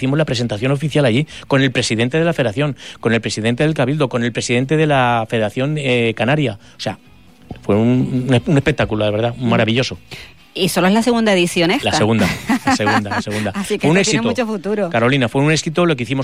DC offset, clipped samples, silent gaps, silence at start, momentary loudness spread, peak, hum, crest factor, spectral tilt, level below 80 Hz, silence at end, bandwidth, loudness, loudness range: 0.5%; under 0.1%; none; 0 s; 7 LU; -4 dBFS; none; 12 dB; -5.5 dB/octave; -46 dBFS; 0 s; 16 kHz; -16 LUFS; 2 LU